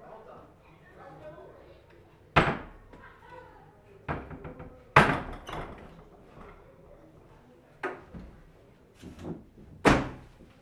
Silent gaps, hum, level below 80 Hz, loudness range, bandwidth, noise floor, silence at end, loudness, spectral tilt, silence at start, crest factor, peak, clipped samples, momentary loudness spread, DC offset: none; none; -48 dBFS; 15 LU; 14 kHz; -57 dBFS; 0.4 s; -28 LUFS; -5.5 dB/octave; 0.05 s; 30 dB; -4 dBFS; under 0.1%; 27 LU; under 0.1%